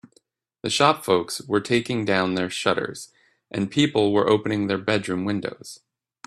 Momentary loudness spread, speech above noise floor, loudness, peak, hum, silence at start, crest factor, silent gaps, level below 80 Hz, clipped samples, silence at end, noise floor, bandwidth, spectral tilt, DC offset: 14 LU; 41 dB; -23 LUFS; -2 dBFS; none; 0.65 s; 22 dB; none; -62 dBFS; under 0.1%; 0.5 s; -64 dBFS; 14.5 kHz; -4.5 dB/octave; under 0.1%